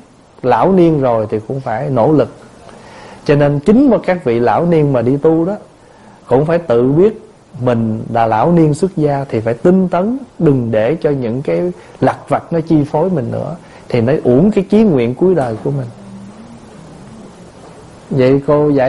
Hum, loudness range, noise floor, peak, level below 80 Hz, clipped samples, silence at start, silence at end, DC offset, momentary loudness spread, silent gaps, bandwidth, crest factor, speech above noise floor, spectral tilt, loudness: none; 3 LU; -41 dBFS; 0 dBFS; -44 dBFS; under 0.1%; 0.45 s; 0 s; 0.3%; 10 LU; none; 11.5 kHz; 14 dB; 29 dB; -9 dB/octave; -13 LUFS